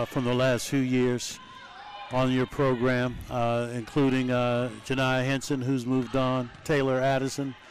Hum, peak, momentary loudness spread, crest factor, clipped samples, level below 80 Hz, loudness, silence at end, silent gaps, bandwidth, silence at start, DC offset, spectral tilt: none; -18 dBFS; 7 LU; 8 dB; under 0.1%; -52 dBFS; -27 LUFS; 0 s; none; 15 kHz; 0 s; 0.2%; -6 dB/octave